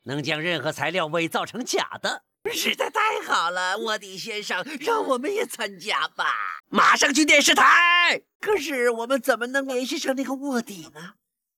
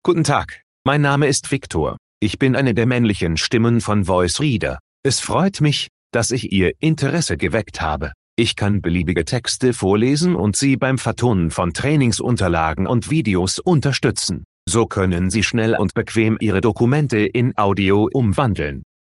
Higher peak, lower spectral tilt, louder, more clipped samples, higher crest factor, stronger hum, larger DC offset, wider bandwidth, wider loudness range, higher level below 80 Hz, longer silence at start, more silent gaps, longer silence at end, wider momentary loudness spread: second, -6 dBFS vs -2 dBFS; second, -2 dB/octave vs -5 dB/octave; second, -22 LUFS vs -18 LUFS; neither; about the same, 16 dB vs 16 dB; neither; neither; first, 17.5 kHz vs 11.5 kHz; first, 8 LU vs 2 LU; second, -68 dBFS vs -42 dBFS; about the same, 0.05 s vs 0.05 s; second, 8.35-8.40 s vs 0.63-0.85 s, 1.98-2.21 s, 4.80-5.03 s, 5.89-6.10 s, 8.14-8.37 s, 14.45-14.67 s; first, 0.45 s vs 0.2 s; first, 14 LU vs 6 LU